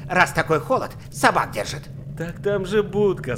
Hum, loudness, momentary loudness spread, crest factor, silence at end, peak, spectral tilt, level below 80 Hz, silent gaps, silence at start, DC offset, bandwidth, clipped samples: none; -22 LUFS; 13 LU; 20 dB; 0 s; -2 dBFS; -5 dB/octave; -44 dBFS; none; 0 s; under 0.1%; 16.5 kHz; under 0.1%